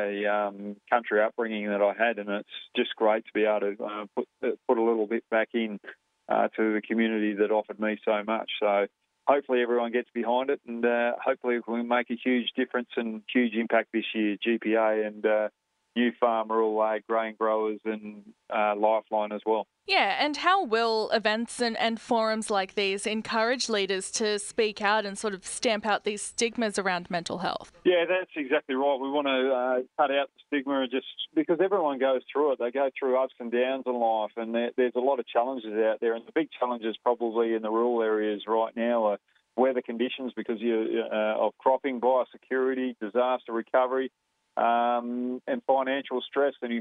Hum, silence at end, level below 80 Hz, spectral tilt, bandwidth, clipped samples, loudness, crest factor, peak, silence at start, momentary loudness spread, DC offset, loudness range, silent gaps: none; 0 s; -74 dBFS; -3.5 dB/octave; 11 kHz; under 0.1%; -27 LUFS; 18 dB; -8 dBFS; 0 s; 6 LU; under 0.1%; 2 LU; none